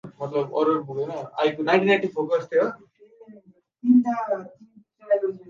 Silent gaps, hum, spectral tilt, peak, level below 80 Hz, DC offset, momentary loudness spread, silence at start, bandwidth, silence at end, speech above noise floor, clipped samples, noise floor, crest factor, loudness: none; none; -7 dB/octave; -4 dBFS; -76 dBFS; under 0.1%; 11 LU; 0.05 s; 7.2 kHz; 0.1 s; 31 dB; under 0.1%; -53 dBFS; 20 dB; -23 LUFS